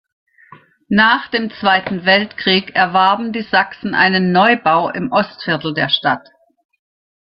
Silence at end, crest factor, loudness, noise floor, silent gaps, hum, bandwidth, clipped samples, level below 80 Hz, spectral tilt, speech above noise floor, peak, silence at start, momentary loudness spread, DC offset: 1.1 s; 16 dB; -15 LUFS; -45 dBFS; none; none; 5.8 kHz; under 0.1%; -56 dBFS; -7.5 dB/octave; 30 dB; 0 dBFS; 0.9 s; 7 LU; under 0.1%